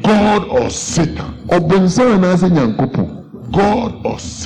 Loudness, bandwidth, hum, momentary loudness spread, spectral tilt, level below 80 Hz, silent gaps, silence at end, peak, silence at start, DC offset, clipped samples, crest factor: -14 LUFS; 10.5 kHz; none; 11 LU; -6 dB/octave; -36 dBFS; none; 0 s; -4 dBFS; 0 s; under 0.1%; under 0.1%; 8 dB